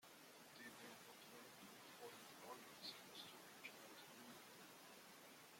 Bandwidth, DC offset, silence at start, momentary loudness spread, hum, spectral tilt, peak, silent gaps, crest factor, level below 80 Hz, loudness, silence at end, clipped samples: 16.5 kHz; under 0.1%; 0 s; 6 LU; none; -2 dB/octave; -42 dBFS; none; 20 dB; under -90 dBFS; -59 LUFS; 0 s; under 0.1%